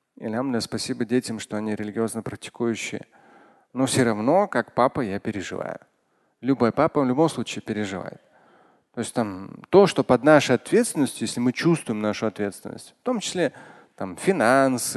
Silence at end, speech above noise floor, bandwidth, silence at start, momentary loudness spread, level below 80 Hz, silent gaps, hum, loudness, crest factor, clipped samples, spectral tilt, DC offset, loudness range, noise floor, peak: 0 s; 45 dB; 12.5 kHz; 0.2 s; 15 LU; -60 dBFS; none; none; -23 LUFS; 22 dB; under 0.1%; -5 dB/octave; under 0.1%; 6 LU; -68 dBFS; -2 dBFS